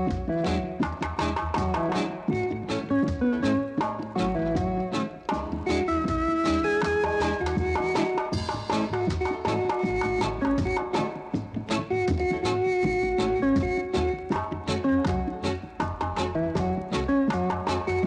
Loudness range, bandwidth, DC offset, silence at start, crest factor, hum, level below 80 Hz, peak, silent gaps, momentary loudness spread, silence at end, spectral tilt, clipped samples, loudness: 2 LU; 10.5 kHz; under 0.1%; 0 s; 14 dB; none; -40 dBFS; -12 dBFS; none; 5 LU; 0 s; -6.5 dB/octave; under 0.1%; -27 LUFS